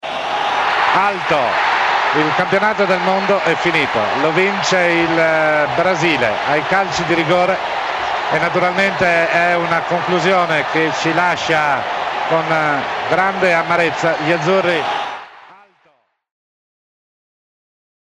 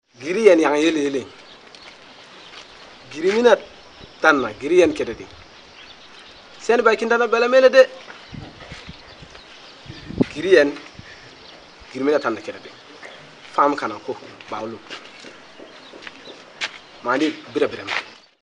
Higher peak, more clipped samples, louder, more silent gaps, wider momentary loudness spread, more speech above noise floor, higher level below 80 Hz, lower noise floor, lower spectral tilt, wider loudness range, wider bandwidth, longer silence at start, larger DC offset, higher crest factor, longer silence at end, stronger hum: about the same, -2 dBFS vs 0 dBFS; neither; first, -15 LUFS vs -19 LUFS; neither; second, 4 LU vs 26 LU; first, 43 dB vs 25 dB; about the same, -52 dBFS vs -56 dBFS; first, -58 dBFS vs -44 dBFS; about the same, -4.5 dB/octave vs -4.5 dB/octave; second, 4 LU vs 8 LU; first, 12 kHz vs 10 kHz; second, 0.05 s vs 0.2 s; neither; second, 14 dB vs 22 dB; first, 2.6 s vs 0.35 s; neither